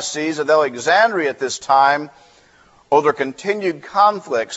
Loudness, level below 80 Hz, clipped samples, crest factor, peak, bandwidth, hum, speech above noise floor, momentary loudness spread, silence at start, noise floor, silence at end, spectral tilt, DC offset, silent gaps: -17 LUFS; -64 dBFS; under 0.1%; 16 dB; -2 dBFS; 8.2 kHz; none; 34 dB; 8 LU; 0 s; -52 dBFS; 0 s; -3 dB/octave; under 0.1%; none